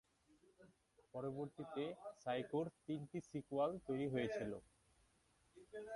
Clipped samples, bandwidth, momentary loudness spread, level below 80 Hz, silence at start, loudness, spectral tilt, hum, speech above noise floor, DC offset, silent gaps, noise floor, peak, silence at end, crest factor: under 0.1%; 11.5 kHz; 9 LU; -76 dBFS; 0.6 s; -46 LUFS; -7 dB/octave; none; 32 dB; under 0.1%; none; -77 dBFS; -28 dBFS; 0 s; 18 dB